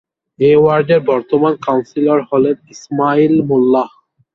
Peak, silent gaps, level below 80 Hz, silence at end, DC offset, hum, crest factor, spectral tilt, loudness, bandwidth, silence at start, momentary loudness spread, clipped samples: 0 dBFS; none; -56 dBFS; 0.45 s; under 0.1%; none; 12 dB; -7.5 dB/octave; -13 LUFS; 7.2 kHz; 0.4 s; 7 LU; under 0.1%